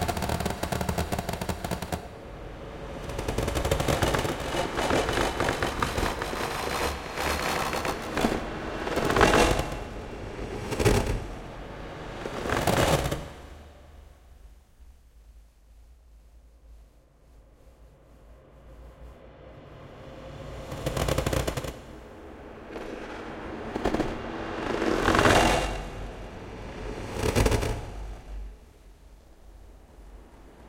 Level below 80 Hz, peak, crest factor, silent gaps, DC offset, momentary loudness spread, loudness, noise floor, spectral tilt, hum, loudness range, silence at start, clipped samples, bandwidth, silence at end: -40 dBFS; -6 dBFS; 24 dB; none; under 0.1%; 20 LU; -28 LUFS; -56 dBFS; -4.5 dB/octave; none; 8 LU; 0 s; under 0.1%; 17 kHz; 0 s